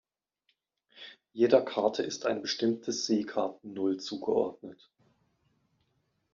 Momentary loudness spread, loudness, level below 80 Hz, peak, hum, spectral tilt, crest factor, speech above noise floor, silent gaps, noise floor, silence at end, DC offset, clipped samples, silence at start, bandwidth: 23 LU; -30 LUFS; -76 dBFS; -8 dBFS; none; -3.5 dB/octave; 24 dB; 48 dB; none; -77 dBFS; 1.6 s; under 0.1%; under 0.1%; 0.95 s; 7.4 kHz